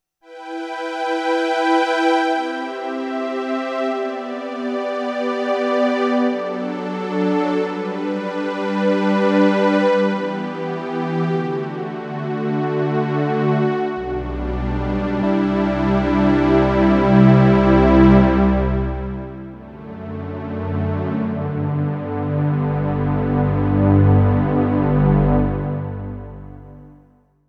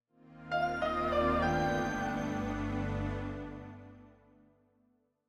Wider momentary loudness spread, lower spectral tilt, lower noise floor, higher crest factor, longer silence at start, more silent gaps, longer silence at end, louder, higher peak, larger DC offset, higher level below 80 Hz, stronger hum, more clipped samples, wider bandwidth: second, 13 LU vs 18 LU; first, -8.5 dB/octave vs -6.5 dB/octave; second, -53 dBFS vs -73 dBFS; about the same, 18 dB vs 18 dB; about the same, 0.3 s vs 0.3 s; neither; second, 0.6 s vs 1.15 s; first, -19 LUFS vs -34 LUFS; first, 0 dBFS vs -18 dBFS; neither; first, -32 dBFS vs -48 dBFS; second, none vs 50 Hz at -50 dBFS; neither; second, 8.4 kHz vs 16 kHz